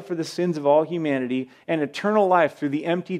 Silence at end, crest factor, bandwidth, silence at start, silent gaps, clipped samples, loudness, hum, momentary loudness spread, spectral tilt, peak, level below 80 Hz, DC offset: 0 s; 16 dB; 13 kHz; 0 s; none; under 0.1%; -23 LUFS; none; 9 LU; -6.5 dB/octave; -6 dBFS; -78 dBFS; under 0.1%